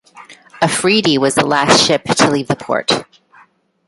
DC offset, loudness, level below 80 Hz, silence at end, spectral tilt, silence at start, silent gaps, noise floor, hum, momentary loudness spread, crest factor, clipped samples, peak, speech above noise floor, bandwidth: under 0.1%; -14 LUFS; -52 dBFS; 0.85 s; -3.5 dB/octave; 0.15 s; none; -50 dBFS; none; 8 LU; 16 dB; under 0.1%; 0 dBFS; 37 dB; 11.5 kHz